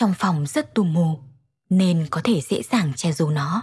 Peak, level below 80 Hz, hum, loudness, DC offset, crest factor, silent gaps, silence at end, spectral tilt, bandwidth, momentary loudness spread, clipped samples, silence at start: -6 dBFS; -64 dBFS; none; -22 LUFS; under 0.1%; 14 dB; none; 0 s; -6.5 dB/octave; 12 kHz; 4 LU; under 0.1%; 0 s